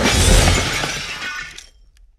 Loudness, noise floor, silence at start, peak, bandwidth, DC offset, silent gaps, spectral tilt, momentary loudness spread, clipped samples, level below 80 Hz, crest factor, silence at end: -17 LUFS; -49 dBFS; 0 s; 0 dBFS; 15 kHz; under 0.1%; none; -3 dB/octave; 15 LU; under 0.1%; -22 dBFS; 18 dB; 0.6 s